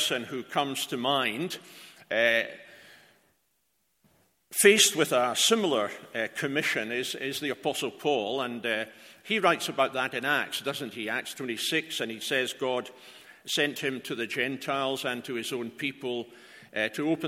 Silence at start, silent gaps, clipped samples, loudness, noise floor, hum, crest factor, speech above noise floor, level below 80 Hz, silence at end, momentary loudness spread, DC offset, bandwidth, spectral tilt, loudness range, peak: 0 s; none; under 0.1%; -28 LUFS; -75 dBFS; none; 26 dB; 46 dB; -78 dBFS; 0 s; 12 LU; under 0.1%; 16.5 kHz; -2 dB/octave; 6 LU; -4 dBFS